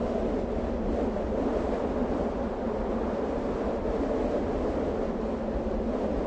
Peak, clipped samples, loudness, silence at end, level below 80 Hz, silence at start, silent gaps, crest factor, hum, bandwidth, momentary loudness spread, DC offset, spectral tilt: -14 dBFS; under 0.1%; -30 LUFS; 0 s; -38 dBFS; 0 s; none; 14 dB; none; 8 kHz; 2 LU; under 0.1%; -8 dB/octave